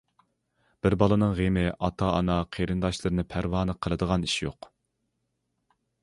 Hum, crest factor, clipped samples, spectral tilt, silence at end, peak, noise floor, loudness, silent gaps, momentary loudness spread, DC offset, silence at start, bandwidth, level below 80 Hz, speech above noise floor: none; 22 dB; under 0.1%; -6.5 dB/octave; 1.5 s; -6 dBFS; -78 dBFS; -27 LUFS; none; 6 LU; under 0.1%; 0.85 s; 11.5 kHz; -42 dBFS; 52 dB